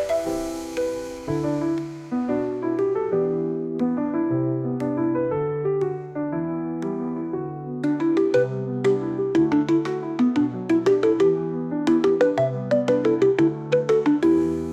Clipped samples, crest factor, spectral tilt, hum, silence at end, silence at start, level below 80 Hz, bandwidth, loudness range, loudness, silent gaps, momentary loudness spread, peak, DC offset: under 0.1%; 14 dB; -7.5 dB/octave; none; 0 s; 0 s; -56 dBFS; 12.5 kHz; 5 LU; -23 LUFS; none; 9 LU; -8 dBFS; under 0.1%